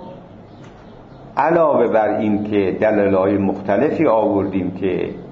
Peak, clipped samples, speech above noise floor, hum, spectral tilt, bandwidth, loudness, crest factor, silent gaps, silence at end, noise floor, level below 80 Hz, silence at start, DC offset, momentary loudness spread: -2 dBFS; under 0.1%; 23 dB; none; -9 dB/octave; 6.4 kHz; -17 LUFS; 14 dB; none; 0 s; -40 dBFS; -52 dBFS; 0 s; under 0.1%; 7 LU